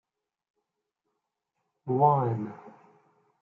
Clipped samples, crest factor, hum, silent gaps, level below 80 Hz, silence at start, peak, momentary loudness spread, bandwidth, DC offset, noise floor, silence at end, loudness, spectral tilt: under 0.1%; 22 dB; none; none; -82 dBFS; 1.85 s; -10 dBFS; 21 LU; 3.7 kHz; under 0.1%; -83 dBFS; 0.75 s; -26 LUFS; -11.5 dB/octave